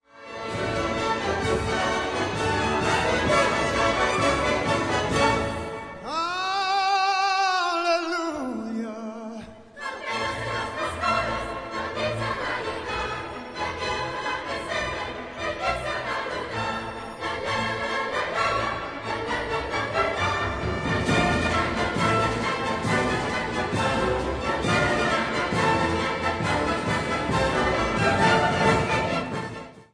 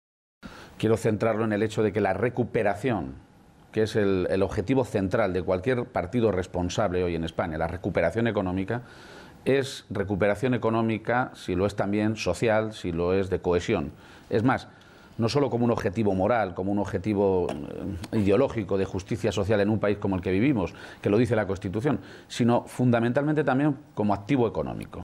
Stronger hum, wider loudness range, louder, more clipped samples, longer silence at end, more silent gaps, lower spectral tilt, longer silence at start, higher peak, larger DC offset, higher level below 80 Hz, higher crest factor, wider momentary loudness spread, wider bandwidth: neither; first, 6 LU vs 2 LU; about the same, -25 LUFS vs -26 LUFS; neither; about the same, 0.1 s vs 0 s; neither; second, -4.5 dB/octave vs -7 dB/octave; second, 0.15 s vs 0.45 s; first, -6 dBFS vs -12 dBFS; neither; first, -42 dBFS vs -52 dBFS; about the same, 18 dB vs 14 dB; about the same, 10 LU vs 8 LU; second, 11 kHz vs 14 kHz